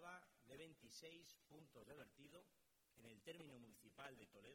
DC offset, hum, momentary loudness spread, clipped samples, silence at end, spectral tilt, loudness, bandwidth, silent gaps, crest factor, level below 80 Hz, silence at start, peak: under 0.1%; none; 7 LU; under 0.1%; 0 s; -3.5 dB/octave; -63 LUFS; 18 kHz; none; 20 dB; -88 dBFS; 0 s; -42 dBFS